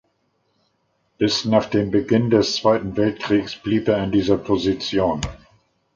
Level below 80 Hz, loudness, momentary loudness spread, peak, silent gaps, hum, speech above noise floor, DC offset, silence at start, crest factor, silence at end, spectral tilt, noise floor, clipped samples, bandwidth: -44 dBFS; -20 LUFS; 5 LU; -2 dBFS; none; none; 48 dB; under 0.1%; 1.2 s; 20 dB; 0.6 s; -5.5 dB/octave; -68 dBFS; under 0.1%; 7.6 kHz